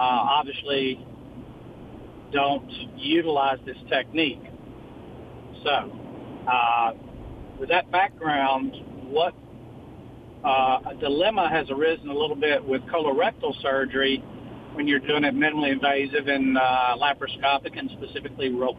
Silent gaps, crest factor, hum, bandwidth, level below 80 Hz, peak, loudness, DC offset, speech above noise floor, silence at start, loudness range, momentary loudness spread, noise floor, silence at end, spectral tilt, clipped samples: none; 16 dB; none; 5 kHz; -54 dBFS; -8 dBFS; -24 LUFS; under 0.1%; 19 dB; 0 s; 4 LU; 21 LU; -43 dBFS; 0 s; -7 dB/octave; under 0.1%